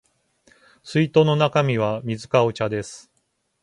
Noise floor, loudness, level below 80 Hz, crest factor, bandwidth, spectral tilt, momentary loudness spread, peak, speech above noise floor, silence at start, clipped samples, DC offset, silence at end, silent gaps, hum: -71 dBFS; -21 LUFS; -58 dBFS; 20 dB; 11 kHz; -6.5 dB/octave; 10 LU; -2 dBFS; 50 dB; 0.85 s; under 0.1%; under 0.1%; 0.65 s; none; none